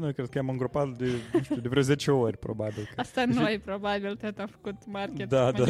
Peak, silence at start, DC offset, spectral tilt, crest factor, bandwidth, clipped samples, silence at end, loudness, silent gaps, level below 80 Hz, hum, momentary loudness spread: -12 dBFS; 0 s; under 0.1%; -6.5 dB/octave; 18 dB; 14 kHz; under 0.1%; 0 s; -29 LUFS; none; -58 dBFS; none; 10 LU